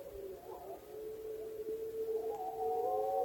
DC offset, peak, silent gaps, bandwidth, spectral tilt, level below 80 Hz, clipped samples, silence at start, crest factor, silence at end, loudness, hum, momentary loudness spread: under 0.1%; -26 dBFS; none; 17 kHz; -5.5 dB/octave; -68 dBFS; under 0.1%; 0 s; 14 dB; 0 s; -41 LUFS; none; 13 LU